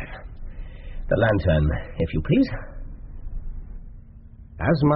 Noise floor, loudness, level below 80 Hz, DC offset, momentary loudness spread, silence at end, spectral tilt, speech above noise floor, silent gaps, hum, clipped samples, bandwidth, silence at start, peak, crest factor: -44 dBFS; -23 LUFS; -32 dBFS; under 0.1%; 21 LU; 0 s; -7 dB/octave; 23 dB; none; none; under 0.1%; 5.4 kHz; 0 s; -8 dBFS; 16 dB